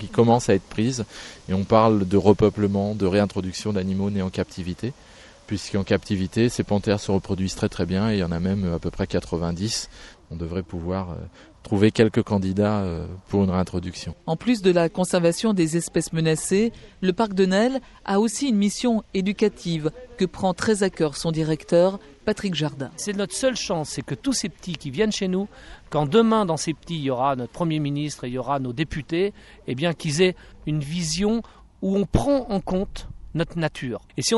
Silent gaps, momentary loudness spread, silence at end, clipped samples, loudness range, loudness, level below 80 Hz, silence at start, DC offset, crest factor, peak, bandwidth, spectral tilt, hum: none; 11 LU; 0 s; under 0.1%; 4 LU; -23 LUFS; -46 dBFS; 0 s; under 0.1%; 22 dB; -2 dBFS; 11.5 kHz; -5.5 dB/octave; none